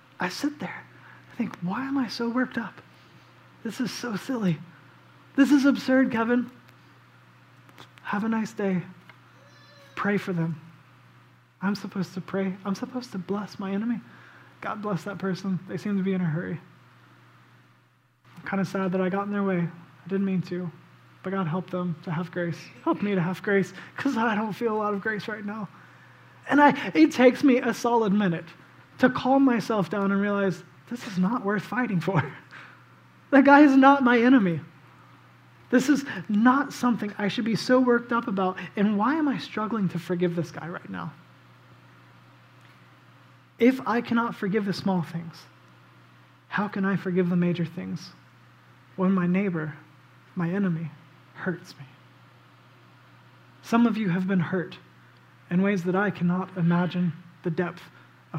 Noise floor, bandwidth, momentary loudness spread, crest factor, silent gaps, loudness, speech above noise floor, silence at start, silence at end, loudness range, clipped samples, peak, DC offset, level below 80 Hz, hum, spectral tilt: -62 dBFS; 15.5 kHz; 16 LU; 24 dB; none; -25 LUFS; 38 dB; 0.2 s; 0 s; 10 LU; under 0.1%; -4 dBFS; under 0.1%; -74 dBFS; none; -7 dB/octave